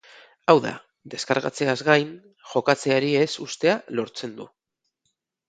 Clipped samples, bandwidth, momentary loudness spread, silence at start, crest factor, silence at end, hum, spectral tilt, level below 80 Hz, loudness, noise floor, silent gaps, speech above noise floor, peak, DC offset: under 0.1%; 9.4 kHz; 15 LU; 0.5 s; 24 dB; 1.05 s; none; -4.5 dB/octave; -70 dBFS; -23 LUFS; -76 dBFS; none; 54 dB; 0 dBFS; under 0.1%